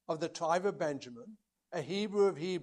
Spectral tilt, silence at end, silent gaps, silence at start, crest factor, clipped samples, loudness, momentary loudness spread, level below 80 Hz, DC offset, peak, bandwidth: -5 dB/octave; 0 s; none; 0.1 s; 18 dB; under 0.1%; -34 LUFS; 13 LU; -80 dBFS; under 0.1%; -16 dBFS; 11 kHz